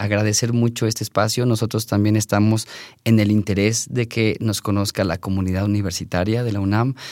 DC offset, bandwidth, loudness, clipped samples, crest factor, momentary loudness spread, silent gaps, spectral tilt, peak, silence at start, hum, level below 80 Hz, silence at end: under 0.1%; 16.5 kHz; -20 LUFS; under 0.1%; 16 dB; 5 LU; none; -5.5 dB/octave; -4 dBFS; 0 s; none; -56 dBFS; 0 s